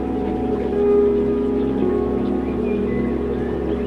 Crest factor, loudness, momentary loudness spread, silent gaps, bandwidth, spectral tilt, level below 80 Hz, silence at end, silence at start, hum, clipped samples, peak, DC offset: 14 dB; -20 LUFS; 6 LU; none; 5.4 kHz; -9.5 dB/octave; -34 dBFS; 0 s; 0 s; none; under 0.1%; -6 dBFS; 0.1%